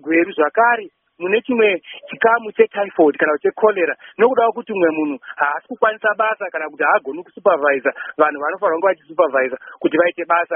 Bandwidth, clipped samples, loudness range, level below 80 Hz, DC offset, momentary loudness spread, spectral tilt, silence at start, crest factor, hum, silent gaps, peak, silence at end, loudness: 3.6 kHz; under 0.1%; 2 LU; -70 dBFS; under 0.1%; 7 LU; 2 dB/octave; 0.05 s; 18 dB; none; none; 0 dBFS; 0 s; -18 LUFS